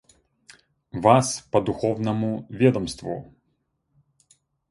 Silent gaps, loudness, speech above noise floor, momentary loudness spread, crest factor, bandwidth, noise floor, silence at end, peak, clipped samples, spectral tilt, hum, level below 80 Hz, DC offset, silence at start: none; -23 LUFS; 51 dB; 15 LU; 22 dB; 11.5 kHz; -73 dBFS; 1.45 s; -2 dBFS; under 0.1%; -6 dB/octave; none; -54 dBFS; under 0.1%; 0.95 s